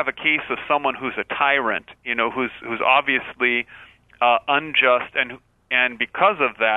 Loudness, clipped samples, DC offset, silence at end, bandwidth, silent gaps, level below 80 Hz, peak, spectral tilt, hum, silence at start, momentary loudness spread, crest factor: -20 LUFS; under 0.1%; under 0.1%; 0 s; 4.1 kHz; none; -60 dBFS; -2 dBFS; -6 dB/octave; none; 0 s; 9 LU; 18 dB